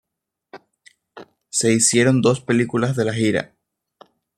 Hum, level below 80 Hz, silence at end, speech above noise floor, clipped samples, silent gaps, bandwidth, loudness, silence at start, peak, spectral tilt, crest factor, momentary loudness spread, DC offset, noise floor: none; -60 dBFS; 0.9 s; 63 dB; under 0.1%; none; 15.5 kHz; -18 LUFS; 0.55 s; -2 dBFS; -4.5 dB/octave; 20 dB; 9 LU; under 0.1%; -81 dBFS